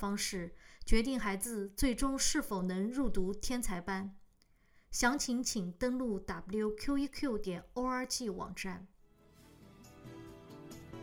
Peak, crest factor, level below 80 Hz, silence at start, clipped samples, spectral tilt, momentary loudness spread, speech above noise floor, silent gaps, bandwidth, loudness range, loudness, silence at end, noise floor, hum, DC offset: -12 dBFS; 22 dB; -46 dBFS; 0 s; under 0.1%; -3.5 dB/octave; 18 LU; 33 dB; none; 18.5 kHz; 5 LU; -36 LUFS; 0 s; -68 dBFS; none; under 0.1%